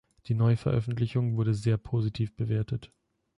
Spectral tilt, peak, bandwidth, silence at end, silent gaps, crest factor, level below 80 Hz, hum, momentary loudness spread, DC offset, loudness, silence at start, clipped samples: -8.5 dB/octave; -16 dBFS; 10.5 kHz; 0.5 s; none; 14 dB; -52 dBFS; none; 7 LU; under 0.1%; -29 LUFS; 0.3 s; under 0.1%